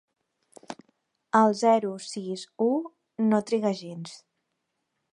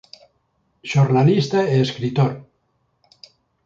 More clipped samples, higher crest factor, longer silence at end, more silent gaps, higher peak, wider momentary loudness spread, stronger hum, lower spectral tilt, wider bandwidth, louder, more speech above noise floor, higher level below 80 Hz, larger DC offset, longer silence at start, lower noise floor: neither; about the same, 20 dB vs 16 dB; second, 0.95 s vs 1.25 s; neither; about the same, -6 dBFS vs -4 dBFS; first, 22 LU vs 10 LU; neither; second, -5.5 dB/octave vs -7 dB/octave; first, 11 kHz vs 7.4 kHz; second, -26 LUFS vs -18 LUFS; first, 55 dB vs 50 dB; second, -78 dBFS vs -58 dBFS; neither; second, 0.7 s vs 0.85 s; first, -80 dBFS vs -67 dBFS